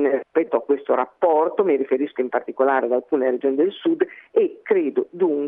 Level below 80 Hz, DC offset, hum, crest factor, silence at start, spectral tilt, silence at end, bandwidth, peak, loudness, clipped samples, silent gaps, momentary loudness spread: -78 dBFS; under 0.1%; none; 16 dB; 0 s; -9 dB/octave; 0 s; 3.8 kHz; -6 dBFS; -21 LUFS; under 0.1%; none; 4 LU